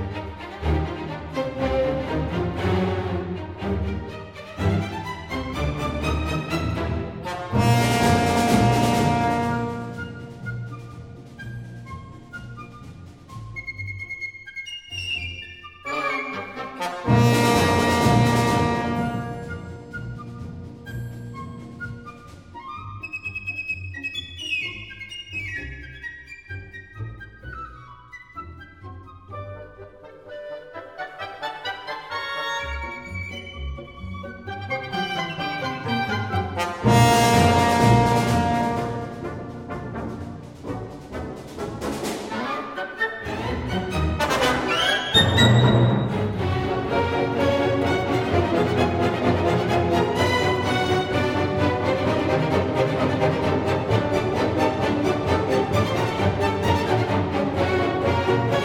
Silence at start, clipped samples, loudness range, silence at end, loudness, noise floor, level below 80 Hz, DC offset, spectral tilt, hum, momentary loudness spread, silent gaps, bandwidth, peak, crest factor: 0 s; under 0.1%; 16 LU; 0 s; -23 LUFS; -44 dBFS; -42 dBFS; under 0.1%; -5.5 dB/octave; none; 19 LU; none; 16.5 kHz; -4 dBFS; 20 dB